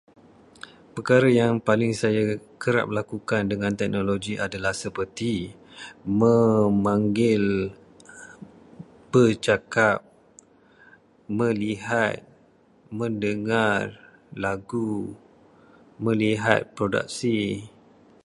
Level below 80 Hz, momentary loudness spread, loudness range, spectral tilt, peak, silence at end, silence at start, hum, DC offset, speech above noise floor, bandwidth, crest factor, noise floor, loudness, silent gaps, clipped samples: -56 dBFS; 18 LU; 5 LU; -6 dB/octave; 0 dBFS; 0.55 s; 0.95 s; none; under 0.1%; 35 dB; 11.5 kHz; 24 dB; -58 dBFS; -24 LUFS; none; under 0.1%